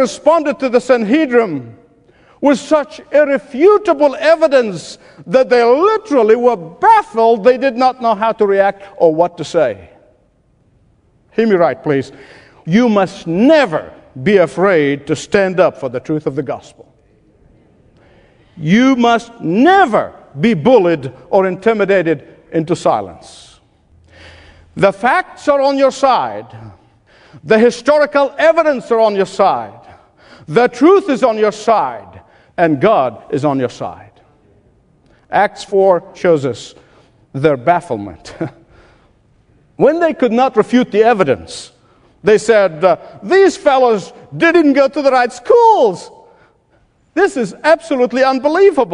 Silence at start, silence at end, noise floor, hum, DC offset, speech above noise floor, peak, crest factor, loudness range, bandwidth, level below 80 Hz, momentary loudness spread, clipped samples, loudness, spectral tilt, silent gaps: 0 s; 0 s; -55 dBFS; none; under 0.1%; 42 dB; 0 dBFS; 14 dB; 6 LU; 10.5 kHz; -52 dBFS; 12 LU; under 0.1%; -13 LUFS; -6 dB/octave; none